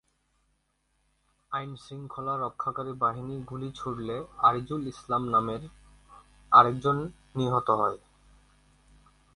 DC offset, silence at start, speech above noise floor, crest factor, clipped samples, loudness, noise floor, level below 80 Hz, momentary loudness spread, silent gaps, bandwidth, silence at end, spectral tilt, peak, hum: under 0.1%; 1.5 s; 45 dB; 26 dB; under 0.1%; -28 LUFS; -74 dBFS; -58 dBFS; 17 LU; none; 11.5 kHz; 1.4 s; -7 dB/octave; -4 dBFS; none